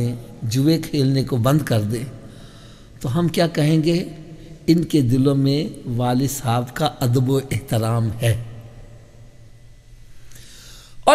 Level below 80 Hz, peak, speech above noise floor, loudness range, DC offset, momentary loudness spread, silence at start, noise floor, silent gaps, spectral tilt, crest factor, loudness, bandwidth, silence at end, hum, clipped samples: -44 dBFS; 0 dBFS; 25 dB; 6 LU; under 0.1%; 18 LU; 0 s; -44 dBFS; none; -6.5 dB/octave; 20 dB; -20 LUFS; 16 kHz; 0 s; none; under 0.1%